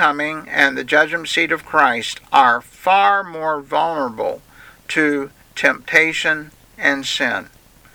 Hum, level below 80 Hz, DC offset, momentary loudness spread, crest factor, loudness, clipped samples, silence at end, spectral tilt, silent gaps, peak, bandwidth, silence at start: none; -56 dBFS; under 0.1%; 9 LU; 18 dB; -17 LUFS; under 0.1%; 0.5 s; -3 dB/octave; none; 0 dBFS; over 20 kHz; 0 s